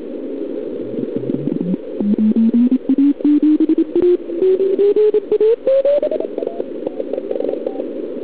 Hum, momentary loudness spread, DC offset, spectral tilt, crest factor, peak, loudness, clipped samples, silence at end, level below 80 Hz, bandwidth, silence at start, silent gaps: none; 11 LU; 1%; -12.5 dB/octave; 10 dB; -6 dBFS; -17 LUFS; under 0.1%; 0 s; -60 dBFS; 4 kHz; 0 s; none